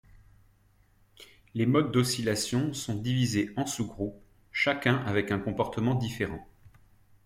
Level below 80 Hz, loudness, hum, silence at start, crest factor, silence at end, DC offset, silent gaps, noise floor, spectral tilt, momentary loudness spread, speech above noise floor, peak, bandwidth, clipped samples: -56 dBFS; -29 LUFS; none; 1.2 s; 20 dB; 0.6 s; under 0.1%; none; -64 dBFS; -5 dB/octave; 9 LU; 35 dB; -10 dBFS; 16 kHz; under 0.1%